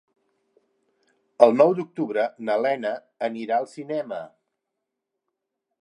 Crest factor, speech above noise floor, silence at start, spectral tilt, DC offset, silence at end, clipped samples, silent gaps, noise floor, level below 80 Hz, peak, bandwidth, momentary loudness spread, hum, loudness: 24 dB; 60 dB; 1.4 s; -6.5 dB/octave; under 0.1%; 1.55 s; under 0.1%; none; -82 dBFS; -78 dBFS; 0 dBFS; 10 kHz; 13 LU; none; -23 LUFS